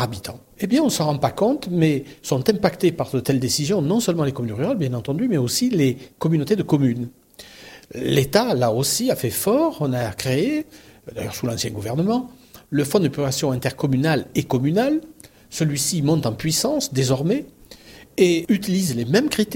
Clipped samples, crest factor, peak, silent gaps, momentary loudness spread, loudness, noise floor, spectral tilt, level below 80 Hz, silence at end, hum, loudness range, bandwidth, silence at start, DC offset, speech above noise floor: under 0.1%; 18 dB; -2 dBFS; none; 9 LU; -21 LUFS; -45 dBFS; -5 dB/octave; -52 dBFS; 0 s; none; 2 LU; 17 kHz; 0 s; under 0.1%; 24 dB